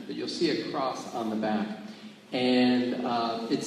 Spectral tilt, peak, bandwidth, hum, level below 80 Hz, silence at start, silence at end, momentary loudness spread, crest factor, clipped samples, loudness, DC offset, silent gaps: -5 dB/octave; -14 dBFS; 10.5 kHz; none; -74 dBFS; 0 s; 0 s; 12 LU; 16 dB; under 0.1%; -28 LUFS; under 0.1%; none